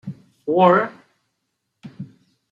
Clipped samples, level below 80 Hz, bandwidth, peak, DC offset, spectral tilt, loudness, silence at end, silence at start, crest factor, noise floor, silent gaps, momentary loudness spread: under 0.1%; -70 dBFS; 7.4 kHz; -2 dBFS; under 0.1%; -8.5 dB/octave; -17 LUFS; 0.45 s; 0.05 s; 20 dB; -75 dBFS; none; 24 LU